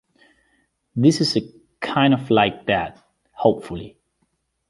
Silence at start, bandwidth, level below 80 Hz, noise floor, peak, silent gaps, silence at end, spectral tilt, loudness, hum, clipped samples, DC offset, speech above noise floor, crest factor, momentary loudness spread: 0.95 s; 11.5 kHz; -54 dBFS; -70 dBFS; -2 dBFS; none; 0.8 s; -5.5 dB/octave; -20 LUFS; none; under 0.1%; under 0.1%; 51 dB; 20 dB; 16 LU